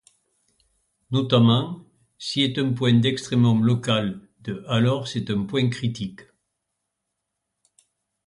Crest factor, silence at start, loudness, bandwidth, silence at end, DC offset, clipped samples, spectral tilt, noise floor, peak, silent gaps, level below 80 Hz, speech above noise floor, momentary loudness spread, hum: 18 dB; 1.1 s; -22 LUFS; 11 kHz; 2.05 s; under 0.1%; under 0.1%; -6.5 dB/octave; -80 dBFS; -6 dBFS; none; -58 dBFS; 59 dB; 15 LU; none